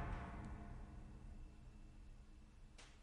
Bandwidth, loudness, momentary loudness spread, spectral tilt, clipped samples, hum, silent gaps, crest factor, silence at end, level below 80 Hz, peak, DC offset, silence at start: 11 kHz; -57 LUFS; 13 LU; -6.5 dB/octave; under 0.1%; none; none; 18 dB; 0 s; -56 dBFS; -36 dBFS; under 0.1%; 0 s